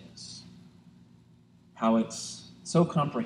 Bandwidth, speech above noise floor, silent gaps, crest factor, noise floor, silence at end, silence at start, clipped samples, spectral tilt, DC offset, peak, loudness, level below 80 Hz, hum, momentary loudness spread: 11 kHz; 32 dB; none; 20 dB; -59 dBFS; 0 s; 0 s; under 0.1%; -6 dB/octave; under 0.1%; -12 dBFS; -28 LUFS; -68 dBFS; 60 Hz at -60 dBFS; 18 LU